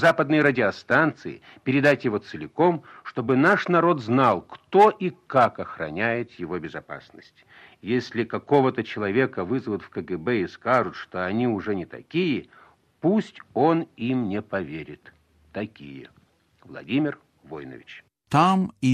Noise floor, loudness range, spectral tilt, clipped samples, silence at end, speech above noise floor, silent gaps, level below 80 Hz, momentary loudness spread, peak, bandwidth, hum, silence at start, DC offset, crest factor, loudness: -59 dBFS; 9 LU; -7 dB/octave; under 0.1%; 0 s; 36 dB; none; -64 dBFS; 19 LU; -4 dBFS; 12.5 kHz; none; 0 s; under 0.1%; 20 dB; -23 LUFS